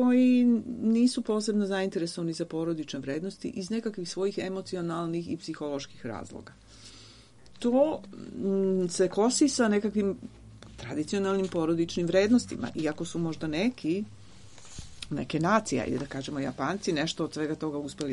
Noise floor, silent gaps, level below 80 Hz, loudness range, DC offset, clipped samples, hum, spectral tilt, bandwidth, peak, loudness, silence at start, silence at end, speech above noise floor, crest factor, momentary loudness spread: -53 dBFS; none; -58 dBFS; 7 LU; under 0.1%; under 0.1%; none; -5 dB/octave; 11.5 kHz; -12 dBFS; -29 LUFS; 0 s; 0 s; 25 dB; 18 dB; 15 LU